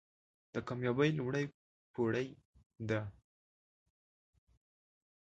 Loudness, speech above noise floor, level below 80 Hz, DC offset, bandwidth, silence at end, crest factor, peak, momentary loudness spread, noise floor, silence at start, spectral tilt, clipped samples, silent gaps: -37 LUFS; over 54 dB; -70 dBFS; under 0.1%; 8.2 kHz; 2.25 s; 22 dB; -18 dBFS; 14 LU; under -90 dBFS; 0.55 s; -7 dB/octave; under 0.1%; 1.54-1.94 s, 2.45-2.53 s, 2.66-2.70 s